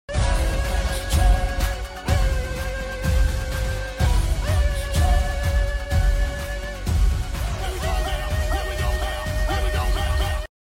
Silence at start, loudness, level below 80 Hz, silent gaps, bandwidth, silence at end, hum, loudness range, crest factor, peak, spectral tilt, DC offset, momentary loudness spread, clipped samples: 0.1 s; -24 LUFS; -22 dBFS; none; 16.5 kHz; 0.2 s; none; 2 LU; 14 dB; -8 dBFS; -5 dB/octave; under 0.1%; 6 LU; under 0.1%